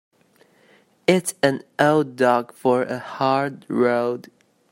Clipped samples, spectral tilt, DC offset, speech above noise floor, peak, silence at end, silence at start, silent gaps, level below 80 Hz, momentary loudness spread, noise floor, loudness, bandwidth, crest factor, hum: under 0.1%; -5 dB/octave; under 0.1%; 37 dB; 0 dBFS; 0.5 s; 1.1 s; none; -66 dBFS; 7 LU; -58 dBFS; -21 LUFS; 16 kHz; 22 dB; none